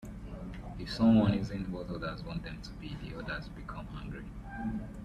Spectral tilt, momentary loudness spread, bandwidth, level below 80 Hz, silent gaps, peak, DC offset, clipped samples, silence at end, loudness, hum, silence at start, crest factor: -7.5 dB/octave; 18 LU; 9.6 kHz; -48 dBFS; none; -14 dBFS; under 0.1%; under 0.1%; 0 s; -34 LUFS; none; 0 s; 20 dB